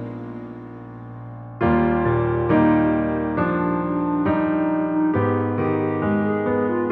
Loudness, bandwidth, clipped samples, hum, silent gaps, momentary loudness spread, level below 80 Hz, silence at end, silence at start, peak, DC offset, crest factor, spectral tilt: -21 LUFS; 4.2 kHz; under 0.1%; none; none; 18 LU; -42 dBFS; 0 s; 0 s; -6 dBFS; under 0.1%; 14 dB; -11.5 dB/octave